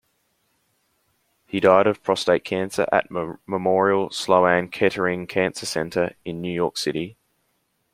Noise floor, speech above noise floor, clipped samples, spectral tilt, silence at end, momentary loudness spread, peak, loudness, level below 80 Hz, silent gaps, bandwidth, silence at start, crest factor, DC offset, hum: -70 dBFS; 49 dB; under 0.1%; -5 dB/octave; 0.8 s; 11 LU; -2 dBFS; -22 LUFS; -60 dBFS; none; 16 kHz; 1.55 s; 22 dB; under 0.1%; none